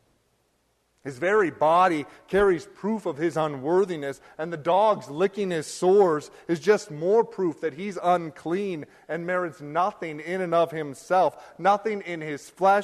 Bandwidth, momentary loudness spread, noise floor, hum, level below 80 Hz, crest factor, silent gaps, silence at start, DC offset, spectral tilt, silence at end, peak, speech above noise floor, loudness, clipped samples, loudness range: 13 kHz; 12 LU; -69 dBFS; none; -60 dBFS; 16 dB; none; 1.05 s; under 0.1%; -5.5 dB/octave; 0 s; -8 dBFS; 45 dB; -25 LUFS; under 0.1%; 4 LU